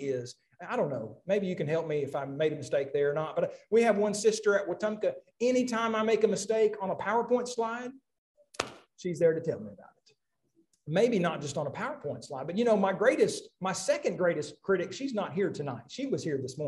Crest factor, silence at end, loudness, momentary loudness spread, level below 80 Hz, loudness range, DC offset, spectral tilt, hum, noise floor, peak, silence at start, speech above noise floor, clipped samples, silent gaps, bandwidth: 24 dB; 0 s; -30 LUFS; 12 LU; -74 dBFS; 4 LU; under 0.1%; -5 dB/octave; none; -72 dBFS; -8 dBFS; 0 s; 42 dB; under 0.1%; 8.18-8.35 s; 12 kHz